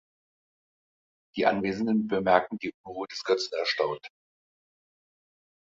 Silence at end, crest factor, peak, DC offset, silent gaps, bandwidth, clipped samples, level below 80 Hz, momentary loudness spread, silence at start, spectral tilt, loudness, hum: 1.6 s; 24 dB; -6 dBFS; under 0.1%; 2.74-2.84 s; 7.8 kHz; under 0.1%; -66 dBFS; 13 LU; 1.35 s; -5 dB/octave; -27 LUFS; none